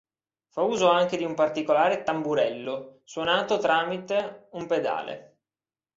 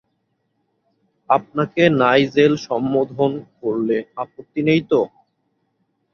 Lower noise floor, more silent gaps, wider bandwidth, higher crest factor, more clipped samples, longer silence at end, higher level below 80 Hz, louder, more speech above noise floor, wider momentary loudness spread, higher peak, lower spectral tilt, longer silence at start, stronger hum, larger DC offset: first, under -90 dBFS vs -70 dBFS; neither; first, 7.8 kHz vs 6.8 kHz; about the same, 20 dB vs 18 dB; neither; second, 0.75 s vs 1.05 s; second, -70 dBFS vs -60 dBFS; second, -25 LUFS vs -19 LUFS; first, over 65 dB vs 52 dB; first, 15 LU vs 12 LU; second, -6 dBFS vs -2 dBFS; second, -4.5 dB/octave vs -7 dB/octave; second, 0.55 s vs 1.3 s; neither; neither